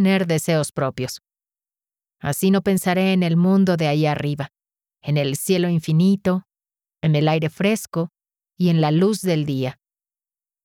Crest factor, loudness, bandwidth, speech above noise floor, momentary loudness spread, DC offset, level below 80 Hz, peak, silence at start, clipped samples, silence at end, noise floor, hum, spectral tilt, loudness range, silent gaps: 14 dB; -20 LUFS; 17 kHz; over 71 dB; 11 LU; under 0.1%; -58 dBFS; -8 dBFS; 0 s; under 0.1%; 0.9 s; under -90 dBFS; none; -6 dB/octave; 2 LU; none